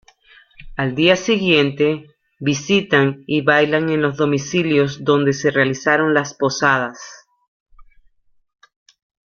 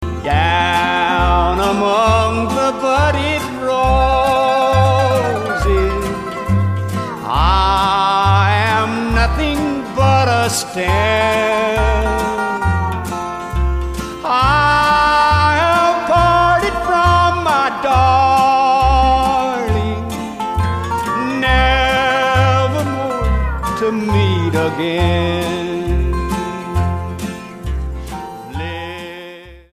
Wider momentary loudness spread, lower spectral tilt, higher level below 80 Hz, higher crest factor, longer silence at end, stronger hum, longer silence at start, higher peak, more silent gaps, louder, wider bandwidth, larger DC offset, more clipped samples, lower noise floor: about the same, 9 LU vs 11 LU; about the same, -5 dB/octave vs -5.5 dB/octave; second, -52 dBFS vs -24 dBFS; about the same, 18 dB vs 14 dB; first, 1.5 s vs 0.15 s; neither; first, 0.6 s vs 0 s; about the same, 0 dBFS vs 0 dBFS; first, 7.48-7.66 s vs none; about the same, -17 LUFS vs -15 LUFS; second, 7.2 kHz vs 15.5 kHz; neither; neither; first, -56 dBFS vs -35 dBFS